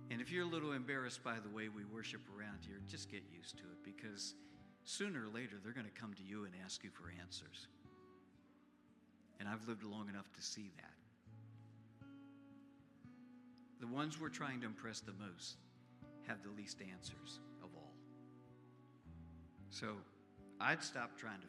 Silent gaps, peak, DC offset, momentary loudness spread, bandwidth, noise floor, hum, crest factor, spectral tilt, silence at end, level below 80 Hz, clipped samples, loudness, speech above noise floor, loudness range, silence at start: none; -20 dBFS; under 0.1%; 20 LU; 14 kHz; -70 dBFS; none; 30 dB; -4 dB/octave; 0 s; -80 dBFS; under 0.1%; -48 LUFS; 22 dB; 8 LU; 0 s